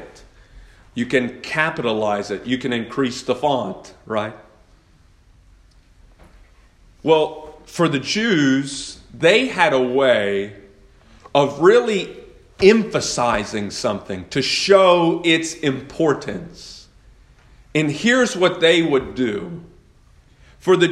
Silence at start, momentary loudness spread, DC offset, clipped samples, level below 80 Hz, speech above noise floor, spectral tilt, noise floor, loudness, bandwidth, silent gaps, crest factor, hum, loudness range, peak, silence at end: 0 s; 16 LU; under 0.1%; under 0.1%; -50 dBFS; 34 dB; -4.5 dB/octave; -52 dBFS; -18 LUFS; 12 kHz; none; 20 dB; none; 8 LU; 0 dBFS; 0 s